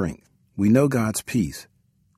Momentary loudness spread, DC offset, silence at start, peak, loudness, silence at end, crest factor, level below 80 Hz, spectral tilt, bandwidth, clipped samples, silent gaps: 17 LU; under 0.1%; 0 s; -6 dBFS; -22 LUFS; 0.55 s; 18 dB; -50 dBFS; -6 dB/octave; 15 kHz; under 0.1%; none